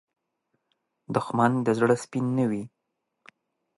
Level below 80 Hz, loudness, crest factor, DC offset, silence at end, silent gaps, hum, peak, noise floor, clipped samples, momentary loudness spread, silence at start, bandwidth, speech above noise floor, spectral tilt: -70 dBFS; -25 LUFS; 22 dB; under 0.1%; 1.1 s; none; none; -6 dBFS; -78 dBFS; under 0.1%; 9 LU; 1.1 s; 11.5 kHz; 53 dB; -7 dB/octave